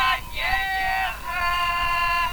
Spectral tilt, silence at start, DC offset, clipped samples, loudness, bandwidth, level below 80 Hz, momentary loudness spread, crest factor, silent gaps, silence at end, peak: -2 dB/octave; 0 s; under 0.1%; under 0.1%; -23 LUFS; over 20 kHz; -38 dBFS; 4 LU; 16 dB; none; 0 s; -8 dBFS